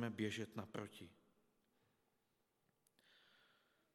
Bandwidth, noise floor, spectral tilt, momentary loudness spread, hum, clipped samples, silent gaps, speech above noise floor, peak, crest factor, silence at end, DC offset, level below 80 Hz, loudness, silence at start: 16 kHz; -84 dBFS; -5.5 dB/octave; 17 LU; none; under 0.1%; none; 36 dB; -30 dBFS; 22 dB; 2.8 s; under 0.1%; under -90 dBFS; -48 LUFS; 0 s